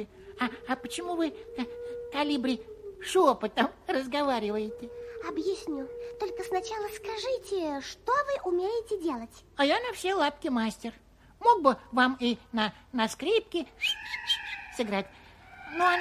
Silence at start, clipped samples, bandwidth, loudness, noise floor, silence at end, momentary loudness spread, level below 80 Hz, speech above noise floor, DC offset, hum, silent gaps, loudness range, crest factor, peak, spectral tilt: 0 s; under 0.1%; 15.5 kHz; -30 LUFS; -50 dBFS; 0 s; 13 LU; -60 dBFS; 20 dB; under 0.1%; none; none; 5 LU; 22 dB; -8 dBFS; -3.5 dB/octave